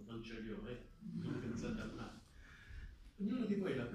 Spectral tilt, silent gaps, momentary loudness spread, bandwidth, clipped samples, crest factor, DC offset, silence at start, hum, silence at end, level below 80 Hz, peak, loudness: -7 dB/octave; none; 19 LU; 11.5 kHz; under 0.1%; 16 dB; under 0.1%; 0 s; none; 0 s; -60 dBFS; -28 dBFS; -44 LUFS